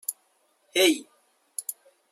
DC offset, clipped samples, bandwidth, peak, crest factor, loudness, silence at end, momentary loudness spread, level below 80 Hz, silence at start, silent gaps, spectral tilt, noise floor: under 0.1%; under 0.1%; 16 kHz; -6 dBFS; 22 dB; -26 LUFS; 0.4 s; 16 LU; -86 dBFS; 0.1 s; none; -0.5 dB/octave; -68 dBFS